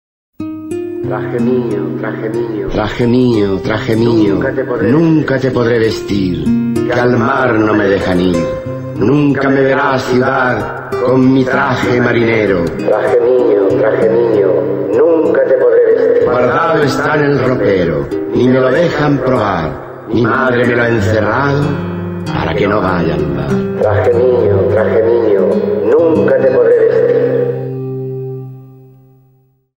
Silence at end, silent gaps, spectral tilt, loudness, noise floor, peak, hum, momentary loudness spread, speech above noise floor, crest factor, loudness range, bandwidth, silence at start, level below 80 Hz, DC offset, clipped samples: 1 s; none; -7.5 dB/octave; -12 LUFS; -52 dBFS; -2 dBFS; none; 9 LU; 41 dB; 10 dB; 3 LU; 16 kHz; 0.4 s; -38 dBFS; under 0.1%; under 0.1%